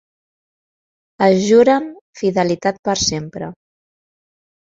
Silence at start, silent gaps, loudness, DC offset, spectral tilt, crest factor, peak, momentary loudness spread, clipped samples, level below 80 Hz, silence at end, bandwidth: 1.2 s; 2.01-2.13 s, 2.79-2.83 s; -16 LUFS; under 0.1%; -4.5 dB/octave; 18 dB; -2 dBFS; 18 LU; under 0.1%; -50 dBFS; 1.15 s; 7.8 kHz